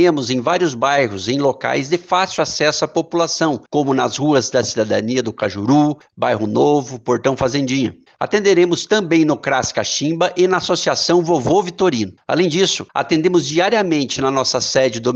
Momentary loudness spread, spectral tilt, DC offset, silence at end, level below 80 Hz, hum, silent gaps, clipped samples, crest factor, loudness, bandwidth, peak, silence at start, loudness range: 5 LU; -4.5 dB/octave; under 0.1%; 0 s; -54 dBFS; none; none; under 0.1%; 14 dB; -17 LUFS; 8.2 kHz; -4 dBFS; 0 s; 2 LU